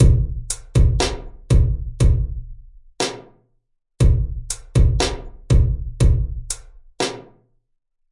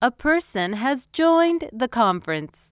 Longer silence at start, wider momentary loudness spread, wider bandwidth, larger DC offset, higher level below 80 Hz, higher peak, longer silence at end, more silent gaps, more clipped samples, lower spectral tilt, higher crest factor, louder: about the same, 0 s vs 0 s; first, 11 LU vs 8 LU; first, 11.5 kHz vs 4 kHz; neither; first, -22 dBFS vs -52 dBFS; first, -2 dBFS vs -6 dBFS; first, 0.9 s vs 0.25 s; neither; neither; second, -5.5 dB/octave vs -9 dB/octave; about the same, 16 dB vs 16 dB; about the same, -21 LUFS vs -22 LUFS